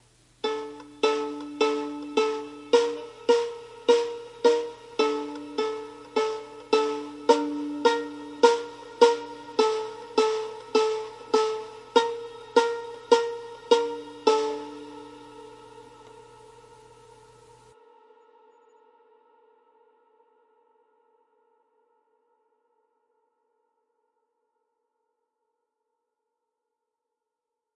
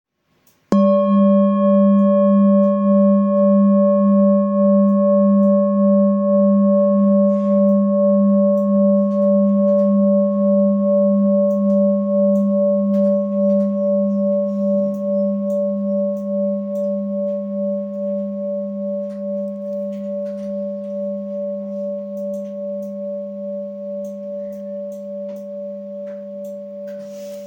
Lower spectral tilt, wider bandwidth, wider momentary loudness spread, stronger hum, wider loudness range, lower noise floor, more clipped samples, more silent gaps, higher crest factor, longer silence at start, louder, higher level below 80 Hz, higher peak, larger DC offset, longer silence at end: second, -2.5 dB/octave vs -11.5 dB/octave; first, 11 kHz vs 3.4 kHz; about the same, 14 LU vs 15 LU; neither; second, 5 LU vs 13 LU; first, -86 dBFS vs -60 dBFS; neither; neither; first, 24 dB vs 12 dB; second, 0.45 s vs 0.7 s; second, -26 LUFS vs -17 LUFS; about the same, -72 dBFS vs -68 dBFS; about the same, -4 dBFS vs -4 dBFS; neither; first, 11.55 s vs 0 s